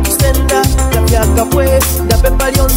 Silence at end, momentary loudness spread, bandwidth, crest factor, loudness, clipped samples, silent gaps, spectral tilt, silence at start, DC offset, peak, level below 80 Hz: 0 s; 1 LU; 16.5 kHz; 10 dB; -11 LUFS; under 0.1%; none; -4.5 dB/octave; 0 s; under 0.1%; 0 dBFS; -14 dBFS